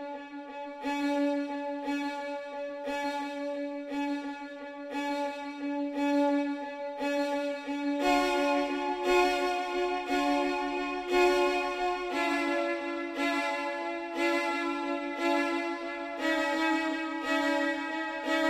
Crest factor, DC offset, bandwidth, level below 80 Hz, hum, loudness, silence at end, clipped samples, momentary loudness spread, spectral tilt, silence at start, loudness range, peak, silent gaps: 18 dB; under 0.1%; 15.5 kHz; -62 dBFS; none; -30 LUFS; 0 s; under 0.1%; 10 LU; -2.5 dB/octave; 0 s; 6 LU; -14 dBFS; none